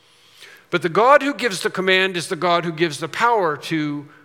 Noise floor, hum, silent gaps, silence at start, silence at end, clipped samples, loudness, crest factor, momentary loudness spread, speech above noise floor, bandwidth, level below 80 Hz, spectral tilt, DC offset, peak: -47 dBFS; none; none; 0.4 s; 0.15 s; under 0.1%; -19 LUFS; 20 dB; 9 LU; 28 dB; 16.5 kHz; -72 dBFS; -4 dB/octave; under 0.1%; 0 dBFS